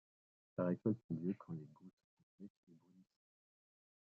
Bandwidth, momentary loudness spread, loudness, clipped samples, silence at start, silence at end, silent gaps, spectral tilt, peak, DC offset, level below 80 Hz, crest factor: 4.3 kHz; 22 LU; -43 LUFS; under 0.1%; 0.6 s; 1.15 s; 1.04-1.09 s, 1.93-1.97 s, 2.04-2.17 s, 2.23-2.38 s, 2.50-2.67 s; -11 dB/octave; -24 dBFS; under 0.1%; -82 dBFS; 22 dB